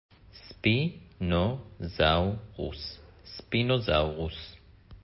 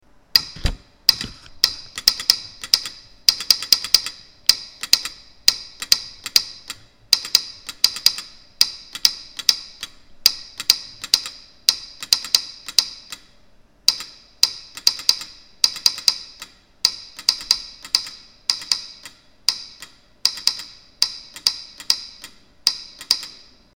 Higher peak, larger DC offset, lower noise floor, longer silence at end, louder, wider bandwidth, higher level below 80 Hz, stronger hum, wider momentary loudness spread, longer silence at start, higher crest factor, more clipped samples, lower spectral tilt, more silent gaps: second, -10 dBFS vs 0 dBFS; second, under 0.1% vs 0.1%; about the same, -51 dBFS vs -54 dBFS; second, 0.05 s vs 0.45 s; second, -29 LUFS vs -19 LUFS; second, 5.8 kHz vs over 20 kHz; about the same, -42 dBFS vs -44 dBFS; neither; first, 19 LU vs 16 LU; about the same, 0.35 s vs 0.35 s; about the same, 20 dB vs 24 dB; neither; first, -10 dB/octave vs 1 dB/octave; neither